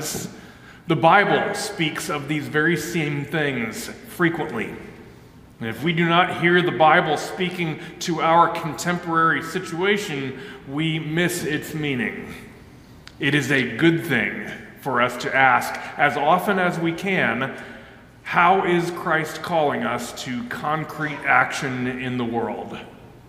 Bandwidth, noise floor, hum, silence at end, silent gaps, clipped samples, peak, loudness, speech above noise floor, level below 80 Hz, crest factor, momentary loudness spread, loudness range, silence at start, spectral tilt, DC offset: 16 kHz; -46 dBFS; none; 0.15 s; none; under 0.1%; -2 dBFS; -21 LUFS; 24 dB; -56 dBFS; 20 dB; 15 LU; 5 LU; 0 s; -5 dB/octave; under 0.1%